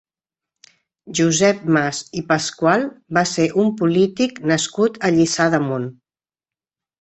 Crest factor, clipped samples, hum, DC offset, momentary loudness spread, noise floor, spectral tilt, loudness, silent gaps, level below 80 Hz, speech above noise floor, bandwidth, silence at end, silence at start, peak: 18 dB; under 0.1%; none; under 0.1%; 7 LU; under -90 dBFS; -4.5 dB/octave; -18 LUFS; none; -58 dBFS; over 72 dB; 8.4 kHz; 1.1 s; 1.05 s; -2 dBFS